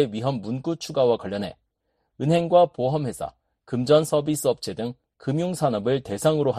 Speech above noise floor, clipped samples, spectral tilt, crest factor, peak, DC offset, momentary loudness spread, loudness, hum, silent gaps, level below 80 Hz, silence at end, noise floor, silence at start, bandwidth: 52 dB; under 0.1%; -6 dB/octave; 18 dB; -4 dBFS; under 0.1%; 13 LU; -24 LUFS; none; none; -58 dBFS; 0 s; -74 dBFS; 0 s; 13.5 kHz